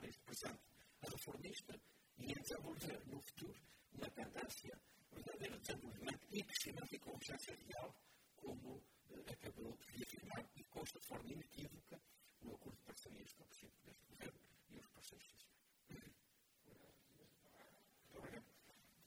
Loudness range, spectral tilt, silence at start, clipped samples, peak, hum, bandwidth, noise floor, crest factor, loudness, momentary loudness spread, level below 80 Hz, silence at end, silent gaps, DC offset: 13 LU; -3.5 dB/octave; 0 s; under 0.1%; -30 dBFS; none; over 20 kHz; -77 dBFS; 26 dB; -54 LUFS; 17 LU; -76 dBFS; 0 s; none; under 0.1%